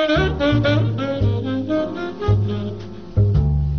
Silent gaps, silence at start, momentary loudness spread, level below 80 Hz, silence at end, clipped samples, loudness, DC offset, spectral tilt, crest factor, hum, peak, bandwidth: none; 0 s; 8 LU; -28 dBFS; 0 s; under 0.1%; -20 LUFS; 0.7%; -6.5 dB/octave; 12 dB; none; -6 dBFS; 6.6 kHz